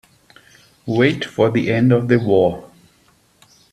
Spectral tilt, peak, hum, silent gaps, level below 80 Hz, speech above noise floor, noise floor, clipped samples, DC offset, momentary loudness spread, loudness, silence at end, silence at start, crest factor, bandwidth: -7.5 dB/octave; 0 dBFS; none; none; -54 dBFS; 40 dB; -56 dBFS; under 0.1%; under 0.1%; 8 LU; -17 LUFS; 1.05 s; 0.85 s; 18 dB; 12.5 kHz